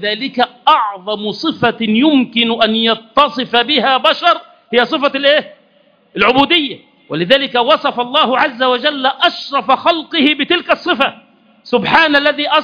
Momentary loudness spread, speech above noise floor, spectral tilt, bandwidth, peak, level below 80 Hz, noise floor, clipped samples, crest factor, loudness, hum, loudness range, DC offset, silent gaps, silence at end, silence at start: 7 LU; 39 dB; -5.5 dB/octave; 5.4 kHz; 0 dBFS; -54 dBFS; -52 dBFS; 0.1%; 14 dB; -13 LUFS; none; 1 LU; under 0.1%; none; 0 s; 0 s